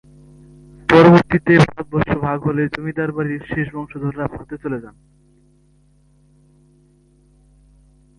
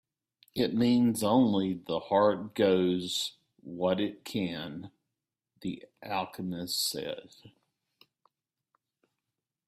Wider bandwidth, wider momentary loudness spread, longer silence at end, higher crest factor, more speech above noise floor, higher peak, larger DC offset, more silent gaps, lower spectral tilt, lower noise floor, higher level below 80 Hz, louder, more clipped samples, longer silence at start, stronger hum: second, 11 kHz vs 15.5 kHz; about the same, 16 LU vs 15 LU; first, 3.3 s vs 2.2 s; about the same, 20 dB vs 20 dB; second, 35 dB vs 58 dB; first, 0 dBFS vs -12 dBFS; neither; neither; first, -8 dB/octave vs -5 dB/octave; second, -55 dBFS vs -88 dBFS; first, -46 dBFS vs -70 dBFS; first, -17 LUFS vs -30 LUFS; neither; first, 0.9 s vs 0.55 s; first, 50 Hz at -45 dBFS vs none